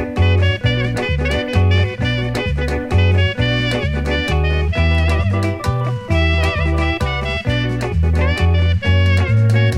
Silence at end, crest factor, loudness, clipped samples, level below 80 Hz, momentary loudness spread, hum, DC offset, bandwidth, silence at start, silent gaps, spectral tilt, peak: 0 s; 12 dB; -17 LUFS; under 0.1%; -24 dBFS; 5 LU; none; under 0.1%; 10.5 kHz; 0 s; none; -6.5 dB/octave; -2 dBFS